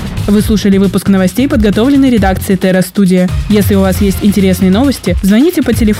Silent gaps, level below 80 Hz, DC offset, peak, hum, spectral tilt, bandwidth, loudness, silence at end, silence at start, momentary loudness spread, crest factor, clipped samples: none; -22 dBFS; under 0.1%; 0 dBFS; none; -6.5 dB/octave; 16.5 kHz; -10 LUFS; 0 s; 0 s; 3 LU; 8 dB; under 0.1%